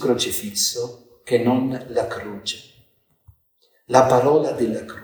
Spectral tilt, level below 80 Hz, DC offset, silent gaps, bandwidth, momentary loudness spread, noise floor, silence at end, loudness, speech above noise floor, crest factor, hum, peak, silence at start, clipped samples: -4 dB/octave; -58 dBFS; under 0.1%; none; over 20 kHz; 14 LU; -63 dBFS; 0 s; -20 LUFS; 43 dB; 22 dB; none; 0 dBFS; 0 s; under 0.1%